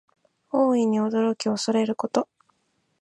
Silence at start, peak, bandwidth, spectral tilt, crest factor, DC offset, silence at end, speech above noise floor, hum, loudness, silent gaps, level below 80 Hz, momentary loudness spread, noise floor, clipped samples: 0.55 s; -6 dBFS; 10.5 kHz; -5 dB/octave; 18 dB; under 0.1%; 0.75 s; 48 dB; none; -24 LUFS; none; -76 dBFS; 7 LU; -71 dBFS; under 0.1%